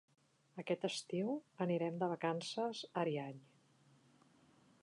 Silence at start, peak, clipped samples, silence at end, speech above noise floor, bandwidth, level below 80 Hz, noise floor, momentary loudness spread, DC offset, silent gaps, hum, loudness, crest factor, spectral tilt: 0.55 s; -24 dBFS; under 0.1%; 1.4 s; 30 dB; 11 kHz; under -90 dBFS; -70 dBFS; 12 LU; under 0.1%; none; none; -41 LUFS; 18 dB; -5.5 dB/octave